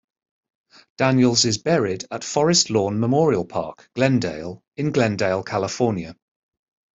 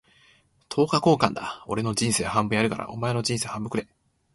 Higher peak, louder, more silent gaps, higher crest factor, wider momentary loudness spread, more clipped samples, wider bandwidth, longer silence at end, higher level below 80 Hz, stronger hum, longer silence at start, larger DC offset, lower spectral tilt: about the same, -4 dBFS vs -2 dBFS; first, -20 LUFS vs -25 LUFS; first, 4.68-4.72 s vs none; second, 18 dB vs 24 dB; about the same, 12 LU vs 10 LU; neither; second, 8.2 kHz vs 12 kHz; first, 0.85 s vs 0.5 s; about the same, -58 dBFS vs -54 dBFS; neither; first, 1 s vs 0.7 s; neither; about the same, -4.5 dB/octave vs -4.5 dB/octave